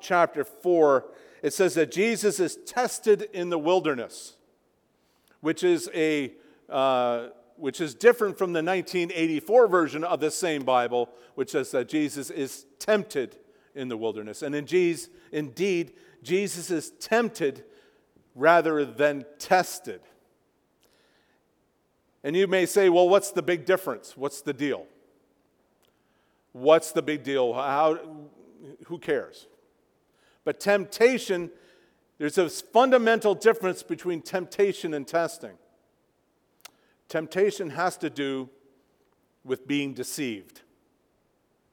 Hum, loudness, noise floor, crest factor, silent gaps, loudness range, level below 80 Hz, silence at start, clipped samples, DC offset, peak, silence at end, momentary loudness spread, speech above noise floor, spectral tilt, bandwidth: none; -26 LUFS; -70 dBFS; 22 dB; none; 7 LU; -76 dBFS; 0.05 s; under 0.1%; under 0.1%; -4 dBFS; 1.3 s; 14 LU; 45 dB; -4.5 dB/octave; 19 kHz